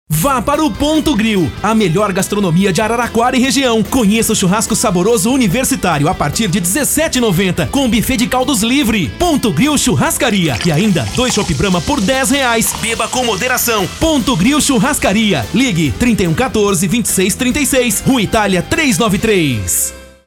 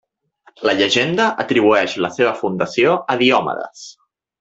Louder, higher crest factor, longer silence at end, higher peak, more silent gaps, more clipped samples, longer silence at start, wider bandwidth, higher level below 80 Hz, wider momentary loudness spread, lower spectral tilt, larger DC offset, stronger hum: first, -13 LUFS vs -16 LUFS; second, 10 dB vs 16 dB; second, 0.2 s vs 0.5 s; about the same, -4 dBFS vs -2 dBFS; neither; neither; second, 0.1 s vs 0.6 s; first, 18 kHz vs 8 kHz; first, -32 dBFS vs -60 dBFS; second, 3 LU vs 11 LU; about the same, -4 dB/octave vs -4.5 dB/octave; neither; neither